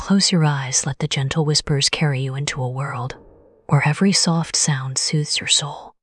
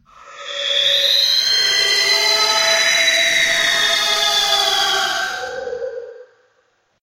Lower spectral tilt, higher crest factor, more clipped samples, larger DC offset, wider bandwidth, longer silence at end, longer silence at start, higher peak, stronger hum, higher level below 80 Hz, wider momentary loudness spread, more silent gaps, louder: first, -3.5 dB/octave vs 2 dB/octave; about the same, 18 dB vs 16 dB; neither; neither; second, 12 kHz vs 16 kHz; second, 0.1 s vs 0.8 s; second, 0 s vs 0.2 s; about the same, -2 dBFS vs -2 dBFS; neither; first, -50 dBFS vs -56 dBFS; second, 9 LU vs 14 LU; neither; second, -19 LUFS vs -13 LUFS